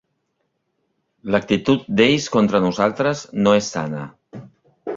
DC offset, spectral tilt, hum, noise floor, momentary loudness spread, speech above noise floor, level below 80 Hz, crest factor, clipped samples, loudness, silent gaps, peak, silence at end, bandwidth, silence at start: under 0.1%; -5.5 dB/octave; none; -72 dBFS; 15 LU; 54 dB; -54 dBFS; 18 dB; under 0.1%; -19 LUFS; none; -2 dBFS; 0 s; 7.6 kHz; 1.25 s